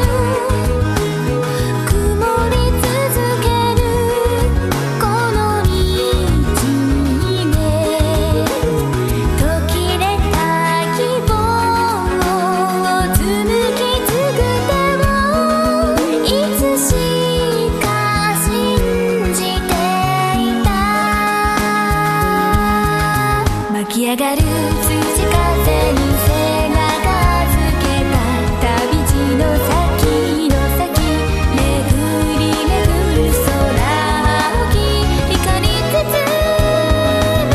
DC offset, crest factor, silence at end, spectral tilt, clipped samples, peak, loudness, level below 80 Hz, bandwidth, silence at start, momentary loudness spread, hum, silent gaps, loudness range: under 0.1%; 14 dB; 0 s; -5 dB/octave; under 0.1%; 0 dBFS; -15 LUFS; -22 dBFS; 14 kHz; 0 s; 2 LU; none; none; 1 LU